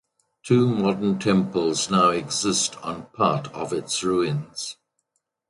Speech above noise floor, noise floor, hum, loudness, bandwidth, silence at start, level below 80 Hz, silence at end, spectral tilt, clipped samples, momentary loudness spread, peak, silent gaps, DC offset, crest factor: 53 dB; -75 dBFS; none; -23 LUFS; 11.5 kHz; 0.45 s; -58 dBFS; 0.75 s; -4.5 dB/octave; under 0.1%; 12 LU; -6 dBFS; none; under 0.1%; 18 dB